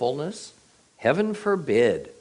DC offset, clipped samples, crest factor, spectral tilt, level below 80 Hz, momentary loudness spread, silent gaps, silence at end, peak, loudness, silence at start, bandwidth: under 0.1%; under 0.1%; 18 dB; -5.5 dB/octave; -64 dBFS; 15 LU; none; 0.1 s; -6 dBFS; -24 LUFS; 0 s; 10.5 kHz